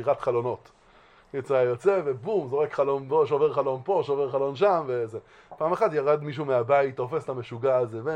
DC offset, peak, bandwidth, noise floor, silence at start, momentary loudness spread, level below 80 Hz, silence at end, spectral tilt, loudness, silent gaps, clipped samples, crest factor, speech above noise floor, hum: under 0.1%; -10 dBFS; 9.4 kHz; -56 dBFS; 0 s; 8 LU; -68 dBFS; 0 s; -7.5 dB/octave; -26 LUFS; none; under 0.1%; 16 dB; 31 dB; none